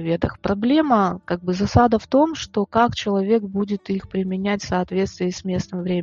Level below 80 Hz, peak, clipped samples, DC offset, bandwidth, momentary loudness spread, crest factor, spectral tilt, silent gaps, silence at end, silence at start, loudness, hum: -44 dBFS; -2 dBFS; under 0.1%; under 0.1%; 7.6 kHz; 8 LU; 18 dB; -6.5 dB/octave; none; 0 s; 0 s; -21 LUFS; none